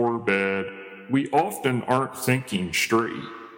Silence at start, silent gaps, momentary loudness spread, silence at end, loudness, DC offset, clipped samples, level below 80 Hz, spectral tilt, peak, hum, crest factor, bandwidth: 0 s; none; 9 LU; 0 s; -24 LUFS; under 0.1%; under 0.1%; -62 dBFS; -5 dB/octave; -6 dBFS; none; 18 dB; 17 kHz